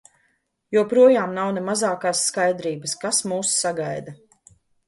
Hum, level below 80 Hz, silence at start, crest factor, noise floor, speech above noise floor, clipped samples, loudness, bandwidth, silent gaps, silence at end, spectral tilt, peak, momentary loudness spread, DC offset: none; -70 dBFS; 0.7 s; 18 dB; -68 dBFS; 48 dB; under 0.1%; -21 LUFS; 11.5 kHz; none; 0.75 s; -3 dB/octave; -4 dBFS; 12 LU; under 0.1%